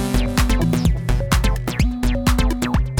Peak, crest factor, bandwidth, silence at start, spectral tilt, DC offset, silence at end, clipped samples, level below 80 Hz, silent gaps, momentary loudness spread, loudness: 0 dBFS; 16 dB; 18 kHz; 0 s; -5.5 dB/octave; under 0.1%; 0 s; under 0.1%; -20 dBFS; none; 3 LU; -20 LUFS